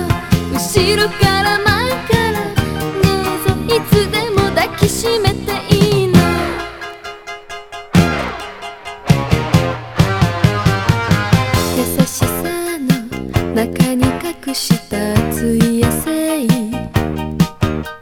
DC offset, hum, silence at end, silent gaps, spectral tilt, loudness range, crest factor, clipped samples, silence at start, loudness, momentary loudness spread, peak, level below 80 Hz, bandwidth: under 0.1%; none; 0 s; none; -5.5 dB/octave; 3 LU; 16 dB; under 0.1%; 0 s; -15 LUFS; 9 LU; 0 dBFS; -32 dBFS; 19 kHz